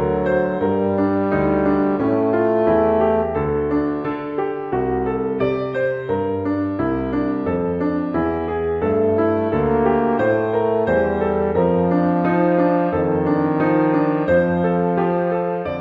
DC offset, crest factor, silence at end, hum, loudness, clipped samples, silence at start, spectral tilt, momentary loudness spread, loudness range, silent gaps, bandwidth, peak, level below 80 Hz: under 0.1%; 14 dB; 0 s; none; -19 LUFS; under 0.1%; 0 s; -10.5 dB/octave; 5 LU; 4 LU; none; 5.2 kHz; -4 dBFS; -40 dBFS